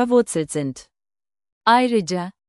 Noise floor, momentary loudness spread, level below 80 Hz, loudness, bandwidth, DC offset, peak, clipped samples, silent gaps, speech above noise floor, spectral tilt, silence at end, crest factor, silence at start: under -90 dBFS; 12 LU; -62 dBFS; -20 LUFS; 12 kHz; under 0.1%; -4 dBFS; under 0.1%; 1.52-1.61 s; over 70 dB; -4.5 dB/octave; 0.2 s; 18 dB; 0 s